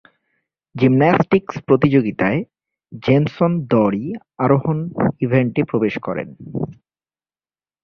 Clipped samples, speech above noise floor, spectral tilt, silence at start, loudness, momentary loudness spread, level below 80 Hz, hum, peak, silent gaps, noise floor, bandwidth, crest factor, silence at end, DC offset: under 0.1%; over 73 dB; -9.5 dB/octave; 0.75 s; -18 LUFS; 13 LU; -52 dBFS; none; -2 dBFS; none; under -90 dBFS; 6.4 kHz; 18 dB; 1.1 s; under 0.1%